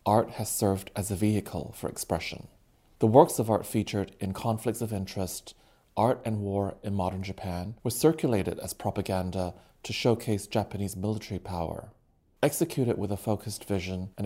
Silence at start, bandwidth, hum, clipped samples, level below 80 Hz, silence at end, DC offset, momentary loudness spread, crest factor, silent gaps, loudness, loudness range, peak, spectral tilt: 0.05 s; 16 kHz; none; under 0.1%; -58 dBFS; 0 s; under 0.1%; 10 LU; 24 dB; none; -29 LUFS; 4 LU; -4 dBFS; -6 dB/octave